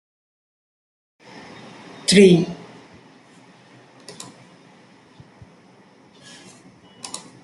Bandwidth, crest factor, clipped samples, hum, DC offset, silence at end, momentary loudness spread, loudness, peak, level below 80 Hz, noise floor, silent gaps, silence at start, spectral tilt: 12 kHz; 22 dB; under 0.1%; none; under 0.1%; 0.25 s; 30 LU; -15 LUFS; -2 dBFS; -62 dBFS; -51 dBFS; none; 2.1 s; -5 dB/octave